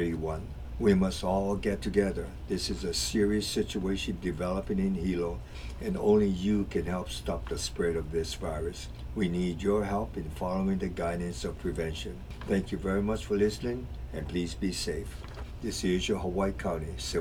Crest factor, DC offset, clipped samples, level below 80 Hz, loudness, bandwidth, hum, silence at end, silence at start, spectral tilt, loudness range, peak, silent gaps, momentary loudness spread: 18 dB; under 0.1%; under 0.1%; -42 dBFS; -31 LUFS; 16.5 kHz; none; 0 s; 0 s; -5.5 dB/octave; 3 LU; -12 dBFS; none; 11 LU